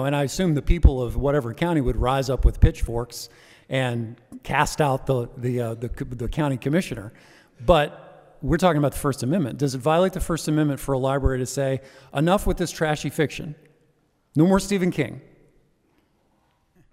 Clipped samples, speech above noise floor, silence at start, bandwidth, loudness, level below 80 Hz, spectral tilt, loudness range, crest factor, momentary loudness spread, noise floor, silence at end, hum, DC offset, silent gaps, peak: under 0.1%; 43 dB; 0 s; 16 kHz; -23 LUFS; -30 dBFS; -6 dB/octave; 3 LU; 20 dB; 11 LU; -65 dBFS; 1.7 s; none; under 0.1%; none; -2 dBFS